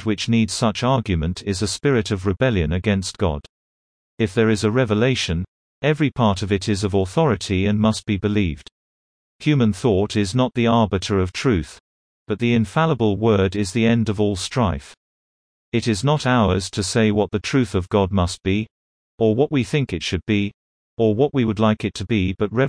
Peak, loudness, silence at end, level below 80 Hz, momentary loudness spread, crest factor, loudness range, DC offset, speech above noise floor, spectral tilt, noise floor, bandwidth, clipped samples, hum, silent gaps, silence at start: -4 dBFS; -20 LUFS; 0 s; -42 dBFS; 6 LU; 16 dB; 2 LU; under 0.1%; over 71 dB; -6 dB/octave; under -90 dBFS; 10.5 kHz; under 0.1%; none; 3.49-4.18 s, 5.48-5.82 s, 8.72-9.39 s, 11.80-12.26 s, 14.97-15.72 s, 18.71-19.18 s, 20.54-20.97 s; 0 s